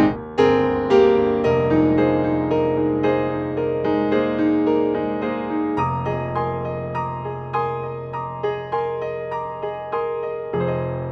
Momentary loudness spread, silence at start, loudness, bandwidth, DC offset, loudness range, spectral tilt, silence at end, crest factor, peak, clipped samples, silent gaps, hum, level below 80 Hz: 10 LU; 0 s; -21 LUFS; 6.6 kHz; under 0.1%; 8 LU; -8.5 dB/octave; 0 s; 16 dB; -4 dBFS; under 0.1%; none; none; -48 dBFS